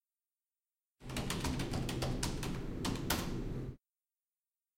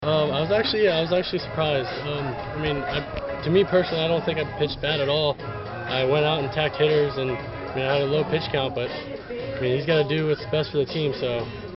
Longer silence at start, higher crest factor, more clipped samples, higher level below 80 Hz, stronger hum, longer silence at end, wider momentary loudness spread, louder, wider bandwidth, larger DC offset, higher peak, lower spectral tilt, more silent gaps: first, 1 s vs 0 s; first, 24 dB vs 18 dB; neither; about the same, -48 dBFS vs -48 dBFS; neither; first, 1 s vs 0 s; about the same, 8 LU vs 9 LU; second, -39 LUFS vs -24 LUFS; first, 16.5 kHz vs 5.8 kHz; neither; second, -16 dBFS vs -6 dBFS; about the same, -4.5 dB/octave vs -4 dB/octave; neither